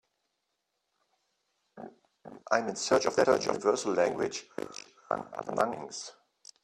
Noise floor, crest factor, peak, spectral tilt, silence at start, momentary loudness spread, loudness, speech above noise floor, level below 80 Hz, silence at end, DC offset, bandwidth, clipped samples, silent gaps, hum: -82 dBFS; 22 dB; -10 dBFS; -3.5 dB/octave; 1.75 s; 22 LU; -30 LUFS; 52 dB; -70 dBFS; 0.5 s; under 0.1%; 13 kHz; under 0.1%; none; none